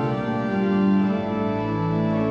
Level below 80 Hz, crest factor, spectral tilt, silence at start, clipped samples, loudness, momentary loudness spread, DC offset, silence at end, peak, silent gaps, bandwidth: -50 dBFS; 12 dB; -9.5 dB/octave; 0 s; under 0.1%; -23 LUFS; 5 LU; under 0.1%; 0 s; -10 dBFS; none; 6.4 kHz